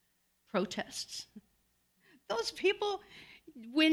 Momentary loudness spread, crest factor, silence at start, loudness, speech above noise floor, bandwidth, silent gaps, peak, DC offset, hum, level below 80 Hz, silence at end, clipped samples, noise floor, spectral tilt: 21 LU; 22 dB; 0.55 s; -35 LUFS; 41 dB; 14.5 kHz; none; -14 dBFS; under 0.1%; none; -74 dBFS; 0 s; under 0.1%; -75 dBFS; -3.5 dB/octave